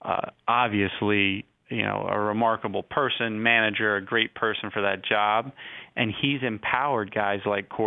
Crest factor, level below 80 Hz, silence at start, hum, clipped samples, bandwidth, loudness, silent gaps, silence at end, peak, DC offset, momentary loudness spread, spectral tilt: 20 dB; -64 dBFS; 0.05 s; none; under 0.1%; 4.1 kHz; -25 LUFS; none; 0 s; -6 dBFS; under 0.1%; 7 LU; -8.5 dB/octave